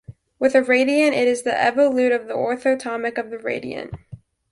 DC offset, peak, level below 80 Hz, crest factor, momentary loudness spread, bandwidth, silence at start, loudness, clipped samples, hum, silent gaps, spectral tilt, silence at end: under 0.1%; -4 dBFS; -56 dBFS; 18 dB; 12 LU; 11.5 kHz; 0.1 s; -20 LUFS; under 0.1%; none; none; -4.5 dB/octave; 0.35 s